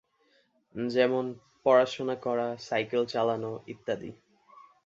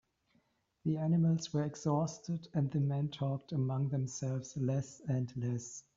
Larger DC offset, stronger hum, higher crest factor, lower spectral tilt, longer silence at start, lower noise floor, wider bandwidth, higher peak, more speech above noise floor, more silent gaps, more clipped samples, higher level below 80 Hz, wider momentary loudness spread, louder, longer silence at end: neither; neither; about the same, 20 dB vs 16 dB; second, -5.5 dB/octave vs -9 dB/octave; about the same, 0.75 s vs 0.85 s; second, -69 dBFS vs -75 dBFS; about the same, 7.8 kHz vs 7.8 kHz; first, -10 dBFS vs -20 dBFS; about the same, 40 dB vs 41 dB; neither; neither; about the same, -72 dBFS vs -70 dBFS; first, 14 LU vs 7 LU; first, -29 LUFS vs -36 LUFS; first, 0.75 s vs 0.15 s